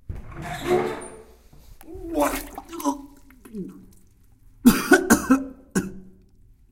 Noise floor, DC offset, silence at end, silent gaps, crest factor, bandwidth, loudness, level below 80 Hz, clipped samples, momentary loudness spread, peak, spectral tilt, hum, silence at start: -53 dBFS; under 0.1%; 0.7 s; none; 22 dB; 17 kHz; -22 LUFS; -44 dBFS; under 0.1%; 22 LU; -2 dBFS; -4.5 dB/octave; none; 0.1 s